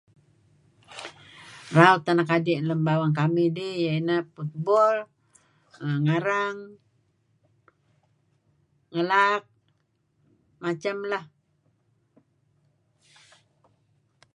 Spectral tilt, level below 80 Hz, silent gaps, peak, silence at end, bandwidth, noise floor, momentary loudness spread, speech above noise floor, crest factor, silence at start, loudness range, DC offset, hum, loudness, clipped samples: -7 dB/octave; -74 dBFS; none; -2 dBFS; 3.1 s; 11 kHz; -71 dBFS; 21 LU; 47 dB; 26 dB; 0.9 s; 13 LU; under 0.1%; none; -24 LUFS; under 0.1%